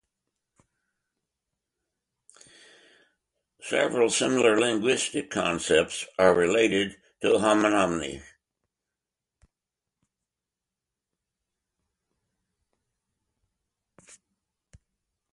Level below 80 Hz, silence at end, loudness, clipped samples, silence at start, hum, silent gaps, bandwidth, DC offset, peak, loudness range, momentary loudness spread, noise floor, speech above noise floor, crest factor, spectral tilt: -60 dBFS; 7.1 s; -24 LUFS; under 0.1%; 3.65 s; none; none; 11.5 kHz; under 0.1%; -8 dBFS; 9 LU; 10 LU; -88 dBFS; 65 dB; 22 dB; -3.5 dB/octave